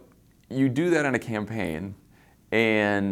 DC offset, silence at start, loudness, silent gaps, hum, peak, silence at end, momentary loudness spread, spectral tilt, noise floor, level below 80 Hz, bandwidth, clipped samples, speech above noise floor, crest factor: under 0.1%; 0.5 s; -25 LUFS; none; none; -8 dBFS; 0 s; 12 LU; -6 dB/octave; -57 dBFS; -58 dBFS; 15.5 kHz; under 0.1%; 32 dB; 18 dB